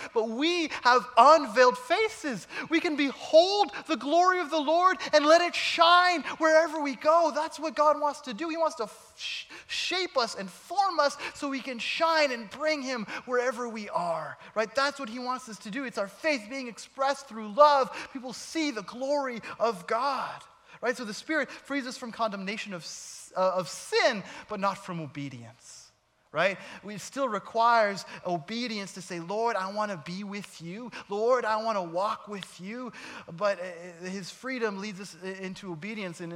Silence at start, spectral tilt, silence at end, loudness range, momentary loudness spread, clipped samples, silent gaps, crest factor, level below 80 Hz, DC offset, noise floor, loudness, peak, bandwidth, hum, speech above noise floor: 0 s; -3.5 dB/octave; 0 s; 10 LU; 16 LU; under 0.1%; none; 22 dB; -74 dBFS; under 0.1%; -62 dBFS; -27 LUFS; -6 dBFS; 14.5 kHz; none; 34 dB